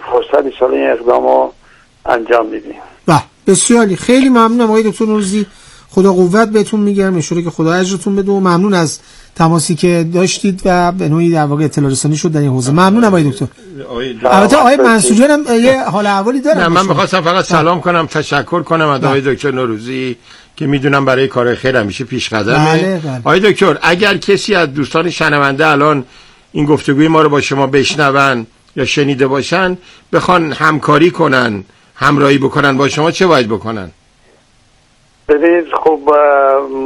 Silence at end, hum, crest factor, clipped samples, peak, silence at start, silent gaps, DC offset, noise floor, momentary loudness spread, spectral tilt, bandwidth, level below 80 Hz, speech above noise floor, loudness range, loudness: 0 s; none; 12 dB; 0.6%; 0 dBFS; 0 s; none; under 0.1%; -50 dBFS; 9 LU; -5 dB/octave; 13 kHz; -42 dBFS; 39 dB; 4 LU; -11 LUFS